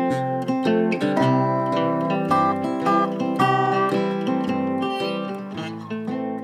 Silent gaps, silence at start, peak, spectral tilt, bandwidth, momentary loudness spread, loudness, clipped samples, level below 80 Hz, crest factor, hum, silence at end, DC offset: none; 0 s; -6 dBFS; -7 dB/octave; 14.5 kHz; 9 LU; -22 LUFS; under 0.1%; -66 dBFS; 14 dB; none; 0 s; under 0.1%